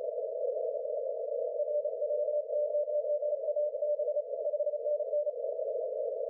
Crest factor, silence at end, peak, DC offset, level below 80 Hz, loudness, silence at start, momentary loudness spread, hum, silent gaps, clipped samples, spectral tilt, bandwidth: 8 dB; 0 s; -24 dBFS; under 0.1%; under -90 dBFS; -33 LUFS; 0 s; 4 LU; none; none; under 0.1%; 0 dB/octave; 0.8 kHz